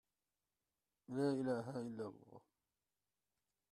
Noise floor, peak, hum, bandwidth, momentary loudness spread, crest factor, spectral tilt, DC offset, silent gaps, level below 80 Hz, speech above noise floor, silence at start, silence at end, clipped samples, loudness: under -90 dBFS; -26 dBFS; none; 12 kHz; 12 LU; 20 dB; -7.5 dB/octave; under 0.1%; none; -86 dBFS; over 48 dB; 1.1 s; 1.3 s; under 0.1%; -43 LUFS